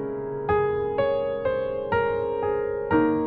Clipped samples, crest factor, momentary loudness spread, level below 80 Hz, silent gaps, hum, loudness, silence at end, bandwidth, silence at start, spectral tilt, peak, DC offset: under 0.1%; 14 dB; 4 LU; -48 dBFS; none; none; -25 LUFS; 0 s; 4.8 kHz; 0 s; -6 dB/octave; -10 dBFS; under 0.1%